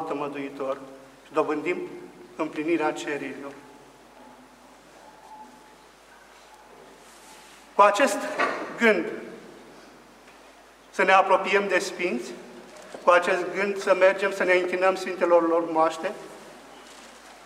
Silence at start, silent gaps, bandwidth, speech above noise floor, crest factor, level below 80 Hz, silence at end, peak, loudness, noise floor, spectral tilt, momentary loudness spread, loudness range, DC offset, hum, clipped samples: 0 s; none; 15.5 kHz; 28 dB; 22 dB; -70 dBFS; 0 s; -4 dBFS; -24 LUFS; -52 dBFS; -4 dB/octave; 25 LU; 10 LU; under 0.1%; none; under 0.1%